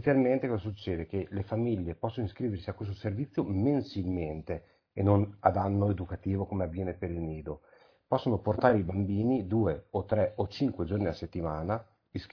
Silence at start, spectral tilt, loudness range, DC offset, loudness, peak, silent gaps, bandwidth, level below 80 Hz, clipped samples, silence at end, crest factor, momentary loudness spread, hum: 0 s; -10 dB/octave; 3 LU; under 0.1%; -31 LUFS; -8 dBFS; none; 5.4 kHz; -52 dBFS; under 0.1%; 0.05 s; 22 dB; 10 LU; none